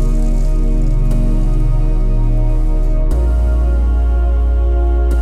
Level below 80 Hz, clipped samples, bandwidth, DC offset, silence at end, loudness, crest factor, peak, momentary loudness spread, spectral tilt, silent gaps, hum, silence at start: -12 dBFS; under 0.1%; 3.2 kHz; 1%; 0 s; -17 LUFS; 8 dB; -4 dBFS; 3 LU; -9 dB/octave; none; none; 0 s